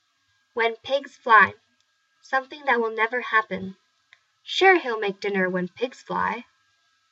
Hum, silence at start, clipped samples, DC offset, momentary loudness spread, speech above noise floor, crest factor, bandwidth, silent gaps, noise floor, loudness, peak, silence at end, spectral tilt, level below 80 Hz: none; 0.55 s; under 0.1%; under 0.1%; 15 LU; 46 dB; 22 dB; 8 kHz; none; -69 dBFS; -23 LUFS; -2 dBFS; 0.7 s; -4.5 dB/octave; -74 dBFS